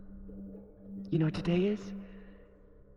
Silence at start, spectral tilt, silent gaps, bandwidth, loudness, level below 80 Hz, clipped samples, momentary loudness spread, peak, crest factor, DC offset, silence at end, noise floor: 0 s; -8.5 dB/octave; none; 7.4 kHz; -32 LUFS; -54 dBFS; under 0.1%; 21 LU; -18 dBFS; 18 dB; under 0.1%; 0 s; -56 dBFS